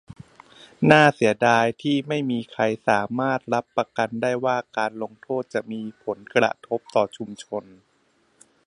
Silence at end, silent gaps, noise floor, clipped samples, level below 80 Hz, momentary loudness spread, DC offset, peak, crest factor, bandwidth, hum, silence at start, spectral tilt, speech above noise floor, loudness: 1.05 s; none; -65 dBFS; under 0.1%; -66 dBFS; 14 LU; under 0.1%; 0 dBFS; 24 dB; 11 kHz; none; 0.8 s; -5.5 dB/octave; 42 dB; -23 LUFS